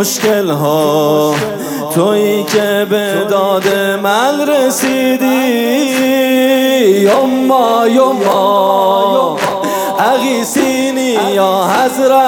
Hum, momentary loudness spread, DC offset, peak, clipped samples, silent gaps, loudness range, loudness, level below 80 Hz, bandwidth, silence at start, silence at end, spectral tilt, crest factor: none; 4 LU; under 0.1%; 0 dBFS; under 0.1%; none; 2 LU; -11 LUFS; -58 dBFS; 18 kHz; 0 s; 0 s; -4 dB/octave; 10 dB